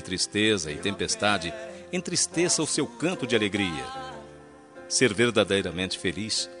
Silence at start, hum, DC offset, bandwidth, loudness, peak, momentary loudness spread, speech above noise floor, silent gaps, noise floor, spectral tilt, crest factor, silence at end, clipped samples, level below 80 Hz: 0 s; none; under 0.1%; 11 kHz; -26 LUFS; -6 dBFS; 12 LU; 22 dB; none; -48 dBFS; -3 dB/octave; 20 dB; 0 s; under 0.1%; -60 dBFS